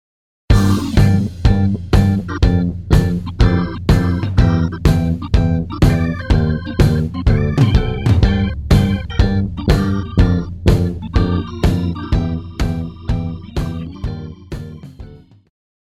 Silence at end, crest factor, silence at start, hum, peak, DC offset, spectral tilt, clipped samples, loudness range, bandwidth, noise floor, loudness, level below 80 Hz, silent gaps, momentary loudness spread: 0.75 s; 14 dB; 0.5 s; none; 0 dBFS; under 0.1%; -7.5 dB/octave; under 0.1%; 6 LU; 14 kHz; -37 dBFS; -16 LUFS; -20 dBFS; none; 10 LU